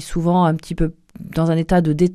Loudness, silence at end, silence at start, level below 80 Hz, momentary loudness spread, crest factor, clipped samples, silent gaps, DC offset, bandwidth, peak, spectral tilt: -19 LUFS; 0 s; 0 s; -32 dBFS; 9 LU; 16 dB; under 0.1%; none; under 0.1%; 12.5 kHz; -2 dBFS; -7.5 dB/octave